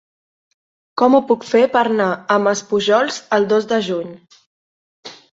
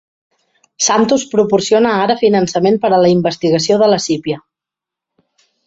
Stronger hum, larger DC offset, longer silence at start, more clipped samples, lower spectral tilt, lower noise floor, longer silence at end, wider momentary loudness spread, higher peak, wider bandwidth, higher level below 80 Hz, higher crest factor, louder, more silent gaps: neither; neither; first, 0.95 s vs 0.8 s; neither; about the same, -4.5 dB/octave vs -4.5 dB/octave; first, under -90 dBFS vs -85 dBFS; second, 0.3 s vs 1.3 s; first, 13 LU vs 5 LU; about the same, -2 dBFS vs 0 dBFS; about the same, 8 kHz vs 8 kHz; second, -64 dBFS vs -56 dBFS; about the same, 16 dB vs 14 dB; second, -16 LUFS vs -13 LUFS; first, 4.46-5.03 s vs none